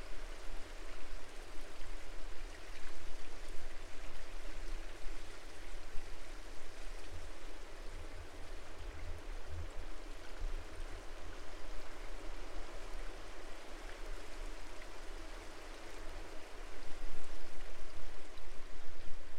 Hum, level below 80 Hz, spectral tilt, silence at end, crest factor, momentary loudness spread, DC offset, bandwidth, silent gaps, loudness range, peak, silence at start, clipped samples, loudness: none; -46 dBFS; -4 dB/octave; 0 s; 14 dB; 3 LU; under 0.1%; 11 kHz; none; 2 LU; -20 dBFS; 0 s; under 0.1%; -52 LUFS